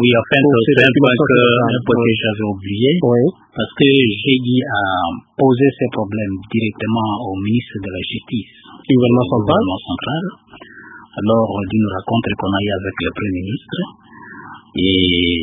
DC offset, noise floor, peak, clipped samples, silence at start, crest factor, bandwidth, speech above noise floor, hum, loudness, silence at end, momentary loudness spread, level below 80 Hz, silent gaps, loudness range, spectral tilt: under 0.1%; -36 dBFS; 0 dBFS; under 0.1%; 0 s; 16 dB; 3.9 kHz; 21 dB; none; -16 LUFS; 0 s; 13 LU; -42 dBFS; none; 6 LU; -8.5 dB/octave